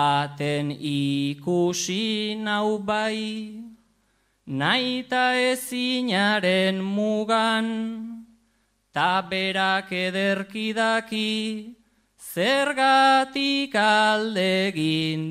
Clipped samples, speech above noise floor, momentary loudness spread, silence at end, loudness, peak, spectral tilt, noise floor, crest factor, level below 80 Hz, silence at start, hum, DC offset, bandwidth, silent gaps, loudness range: under 0.1%; 44 dB; 11 LU; 0 s; -23 LUFS; -6 dBFS; -4 dB/octave; -68 dBFS; 18 dB; -68 dBFS; 0 s; none; under 0.1%; 15.5 kHz; none; 5 LU